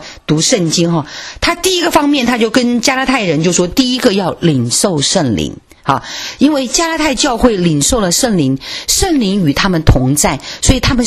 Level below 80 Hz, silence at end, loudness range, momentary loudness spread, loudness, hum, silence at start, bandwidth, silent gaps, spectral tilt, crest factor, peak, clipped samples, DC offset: -26 dBFS; 0 s; 1 LU; 5 LU; -12 LUFS; none; 0 s; 14.5 kHz; none; -4 dB/octave; 12 dB; 0 dBFS; 0.2%; under 0.1%